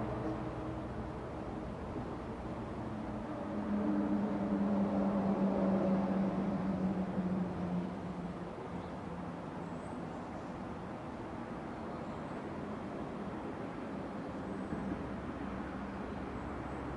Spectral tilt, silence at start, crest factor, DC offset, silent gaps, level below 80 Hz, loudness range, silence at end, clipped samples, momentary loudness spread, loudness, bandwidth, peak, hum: -8.5 dB/octave; 0 s; 16 dB; under 0.1%; none; -56 dBFS; 10 LU; 0 s; under 0.1%; 10 LU; -38 LUFS; 10.5 kHz; -22 dBFS; none